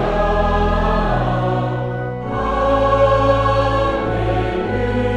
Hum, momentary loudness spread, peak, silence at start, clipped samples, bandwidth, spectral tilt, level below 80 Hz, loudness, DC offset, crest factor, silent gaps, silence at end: none; 8 LU; -4 dBFS; 0 s; under 0.1%; 9 kHz; -7.5 dB/octave; -26 dBFS; -18 LUFS; under 0.1%; 14 dB; none; 0 s